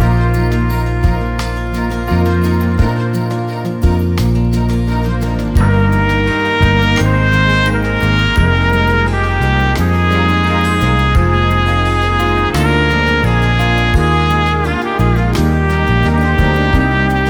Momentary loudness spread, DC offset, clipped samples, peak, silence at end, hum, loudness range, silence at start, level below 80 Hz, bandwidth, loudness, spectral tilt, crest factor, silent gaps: 4 LU; under 0.1%; under 0.1%; 0 dBFS; 0 s; none; 3 LU; 0 s; -20 dBFS; 18.5 kHz; -13 LUFS; -6.5 dB/octave; 12 dB; none